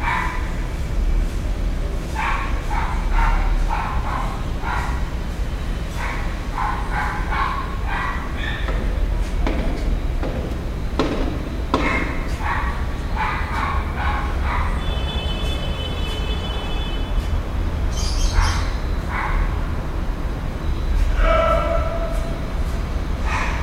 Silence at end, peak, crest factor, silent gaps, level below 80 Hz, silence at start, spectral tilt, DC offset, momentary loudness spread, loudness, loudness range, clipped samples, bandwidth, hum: 0 s; -4 dBFS; 18 dB; none; -22 dBFS; 0 s; -5.5 dB/octave; under 0.1%; 6 LU; -24 LUFS; 2 LU; under 0.1%; 14 kHz; none